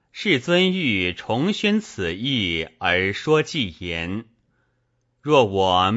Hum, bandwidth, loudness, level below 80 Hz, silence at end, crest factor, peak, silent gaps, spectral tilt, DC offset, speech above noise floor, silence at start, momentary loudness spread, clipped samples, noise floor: none; 8 kHz; -21 LUFS; -52 dBFS; 0 s; 18 dB; -4 dBFS; none; -5 dB/octave; under 0.1%; 48 dB; 0.15 s; 9 LU; under 0.1%; -69 dBFS